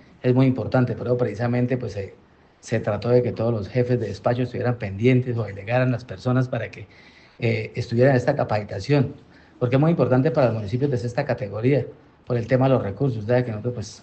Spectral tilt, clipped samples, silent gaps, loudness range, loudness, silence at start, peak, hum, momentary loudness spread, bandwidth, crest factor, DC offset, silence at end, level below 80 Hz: -8 dB/octave; under 0.1%; none; 3 LU; -23 LUFS; 0.25 s; -6 dBFS; none; 9 LU; 8.2 kHz; 16 dB; under 0.1%; 0.05 s; -56 dBFS